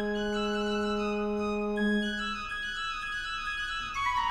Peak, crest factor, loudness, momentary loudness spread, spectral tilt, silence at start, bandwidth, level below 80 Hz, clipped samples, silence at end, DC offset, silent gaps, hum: -18 dBFS; 12 dB; -31 LUFS; 5 LU; -4.5 dB/octave; 0 s; 11 kHz; -48 dBFS; under 0.1%; 0 s; under 0.1%; none; none